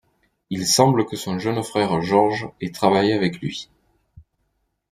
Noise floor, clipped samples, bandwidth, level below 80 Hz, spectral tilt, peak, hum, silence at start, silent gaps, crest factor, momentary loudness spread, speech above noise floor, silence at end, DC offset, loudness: -71 dBFS; under 0.1%; 15.5 kHz; -58 dBFS; -4.5 dB/octave; -2 dBFS; none; 0.5 s; none; 20 dB; 14 LU; 51 dB; 0.7 s; under 0.1%; -20 LUFS